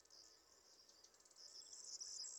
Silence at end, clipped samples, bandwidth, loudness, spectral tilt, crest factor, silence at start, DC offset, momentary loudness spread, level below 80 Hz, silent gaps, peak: 0 s; under 0.1%; 17.5 kHz; -56 LUFS; 2.5 dB/octave; 18 dB; 0 s; under 0.1%; 16 LU; under -90 dBFS; none; -40 dBFS